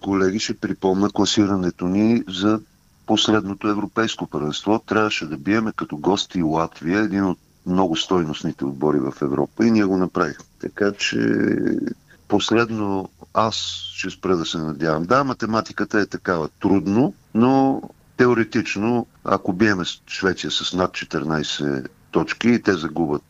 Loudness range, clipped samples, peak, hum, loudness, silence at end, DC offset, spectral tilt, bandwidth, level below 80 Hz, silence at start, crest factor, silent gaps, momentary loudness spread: 2 LU; under 0.1%; -4 dBFS; none; -21 LUFS; 0.1 s; under 0.1%; -5 dB/octave; 8.2 kHz; -52 dBFS; 0.05 s; 18 dB; none; 7 LU